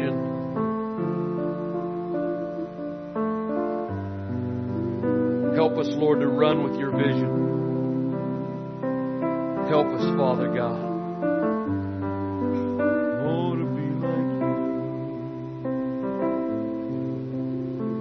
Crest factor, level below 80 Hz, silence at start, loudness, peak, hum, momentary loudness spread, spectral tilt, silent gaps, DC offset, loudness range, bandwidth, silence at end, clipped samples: 18 dB; -62 dBFS; 0 s; -26 LUFS; -6 dBFS; none; 8 LU; -9 dB/octave; none; under 0.1%; 5 LU; 6.2 kHz; 0 s; under 0.1%